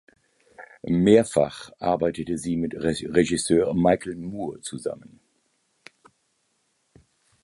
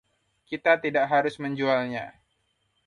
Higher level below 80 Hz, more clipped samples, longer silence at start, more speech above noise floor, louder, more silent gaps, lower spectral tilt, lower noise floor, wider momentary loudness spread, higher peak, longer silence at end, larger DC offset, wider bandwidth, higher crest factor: first, -52 dBFS vs -70 dBFS; neither; about the same, 0.6 s vs 0.5 s; about the same, 48 dB vs 48 dB; about the same, -24 LUFS vs -25 LUFS; neither; about the same, -5.5 dB/octave vs -6.5 dB/octave; about the same, -71 dBFS vs -73 dBFS; about the same, 15 LU vs 13 LU; about the same, -4 dBFS vs -6 dBFS; first, 2.4 s vs 0.75 s; neither; about the same, 11.5 kHz vs 11 kHz; about the same, 22 dB vs 22 dB